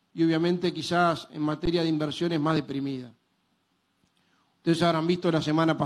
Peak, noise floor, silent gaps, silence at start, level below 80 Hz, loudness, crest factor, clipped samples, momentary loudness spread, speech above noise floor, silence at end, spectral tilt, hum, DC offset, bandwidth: -10 dBFS; -72 dBFS; none; 0.15 s; -52 dBFS; -26 LUFS; 18 dB; under 0.1%; 8 LU; 47 dB; 0 s; -6.5 dB/octave; none; under 0.1%; 12 kHz